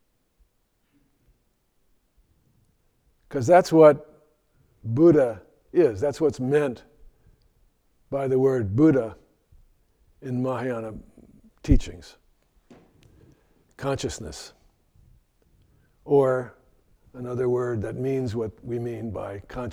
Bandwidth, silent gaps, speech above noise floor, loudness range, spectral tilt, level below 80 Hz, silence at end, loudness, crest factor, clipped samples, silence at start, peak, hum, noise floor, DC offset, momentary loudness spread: 13 kHz; none; 47 dB; 12 LU; -7.5 dB/octave; -40 dBFS; 0 s; -23 LUFS; 22 dB; under 0.1%; 3.3 s; -4 dBFS; none; -70 dBFS; under 0.1%; 21 LU